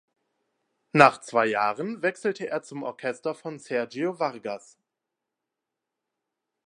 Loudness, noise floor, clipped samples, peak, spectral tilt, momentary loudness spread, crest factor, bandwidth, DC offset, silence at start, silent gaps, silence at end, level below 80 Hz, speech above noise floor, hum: -26 LUFS; -86 dBFS; under 0.1%; 0 dBFS; -5.5 dB/octave; 17 LU; 28 dB; 11.5 kHz; under 0.1%; 0.95 s; none; 2.1 s; -76 dBFS; 60 dB; none